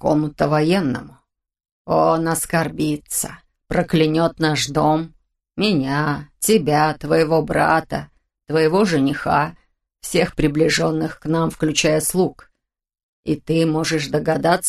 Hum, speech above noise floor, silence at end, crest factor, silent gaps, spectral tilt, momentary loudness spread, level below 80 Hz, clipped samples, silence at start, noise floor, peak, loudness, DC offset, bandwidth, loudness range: none; 62 dB; 0 s; 18 dB; 1.72-1.85 s, 13.03-13.23 s; -5 dB/octave; 7 LU; -44 dBFS; under 0.1%; 0 s; -80 dBFS; -2 dBFS; -19 LUFS; under 0.1%; 13 kHz; 2 LU